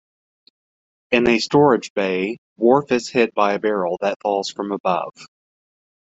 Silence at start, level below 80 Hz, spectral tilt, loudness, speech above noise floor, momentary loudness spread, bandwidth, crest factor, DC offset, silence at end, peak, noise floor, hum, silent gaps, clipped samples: 1.1 s; -58 dBFS; -5 dB/octave; -19 LUFS; over 71 dB; 8 LU; 8 kHz; 18 dB; under 0.1%; 0.85 s; -2 dBFS; under -90 dBFS; none; 1.90-1.96 s, 2.38-2.56 s, 4.16-4.20 s, 4.80-4.84 s; under 0.1%